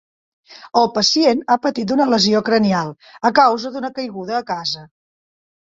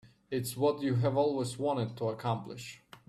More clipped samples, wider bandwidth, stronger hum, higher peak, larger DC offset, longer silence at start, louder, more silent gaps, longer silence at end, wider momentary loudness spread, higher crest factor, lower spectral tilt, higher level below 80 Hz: neither; second, 7.8 kHz vs 13.5 kHz; neither; first, 0 dBFS vs -16 dBFS; neither; first, 0.5 s vs 0.05 s; first, -17 LUFS vs -32 LUFS; neither; first, 0.85 s vs 0.1 s; about the same, 12 LU vs 11 LU; about the same, 18 dB vs 16 dB; second, -4 dB/octave vs -6.5 dB/octave; first, -60 dBFS vs -68 dBFS